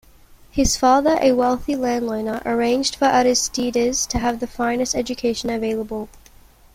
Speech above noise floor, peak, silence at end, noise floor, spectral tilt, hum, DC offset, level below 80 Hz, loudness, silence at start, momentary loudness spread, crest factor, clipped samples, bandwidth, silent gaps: 29 dB; -4 dBFS; 0.6 s; -48 dBFS; -3 dB/octave; none; under 0.1%; -40 dBFS; -20 LUFS; 0.55 s; 9 LU; 16 dB; under 0.1%; 16.5 kHz; none